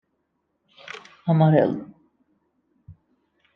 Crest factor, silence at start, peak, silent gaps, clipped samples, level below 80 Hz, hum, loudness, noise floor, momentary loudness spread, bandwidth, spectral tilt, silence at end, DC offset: 22 dB; 0.85 s; -4 dBFS; none; under 0.1%; -68 dBFS; none; -21 LUFS; -74 dBFS; 22 LU; 6.2 kHz; -9.5 dB/octave; 0.65 s; under 0.1%